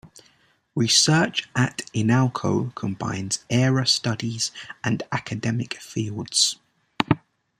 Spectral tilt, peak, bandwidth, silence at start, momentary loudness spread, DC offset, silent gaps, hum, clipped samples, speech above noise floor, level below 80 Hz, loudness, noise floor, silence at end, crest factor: -4 dB/octave; -2 dBFS; 14.5 kHz; 0.05 s; 11 LU; under 0.1%; none; none; under 0.1%; 38 dB; -58 dBFS; -23 LUFS; -61 dBFS; 0.4 s; 22 dB